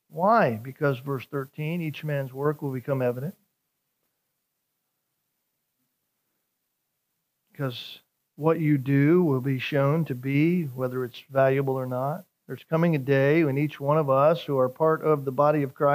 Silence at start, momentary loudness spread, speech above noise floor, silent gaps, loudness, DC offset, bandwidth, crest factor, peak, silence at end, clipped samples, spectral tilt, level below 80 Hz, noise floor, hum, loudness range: 0.15 s; 12 LU; 55 dB; none; -25 LUFS; under 0.1%; 15.5 kHz; 18 dB; -8 dBFS; 0 s; under 0.1%; -8.5 dB/octave; -78 dBFS; -79 dBFS; none; 12 LU